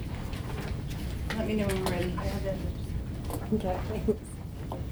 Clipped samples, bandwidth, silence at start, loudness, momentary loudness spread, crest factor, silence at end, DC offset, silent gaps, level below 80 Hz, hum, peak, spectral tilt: under 0.1%; over 20 kHz; 0 s; -33 LUFS; 7 LU; 18 dB; 0 s; under 0.1%; none; -38 dBFS; none; -14 dBFS; -6.5 dB/octave